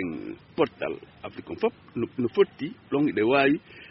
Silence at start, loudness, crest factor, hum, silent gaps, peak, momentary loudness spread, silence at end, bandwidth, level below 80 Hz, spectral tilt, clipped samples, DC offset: 0 s; -26 LUFS; 18 dB; none; none; -8 dBFS; 16 LU; 0.05 s; 5.8 kHz; -62 dBFS; -4.5 dB/octave; under 0.1%; under 0.1%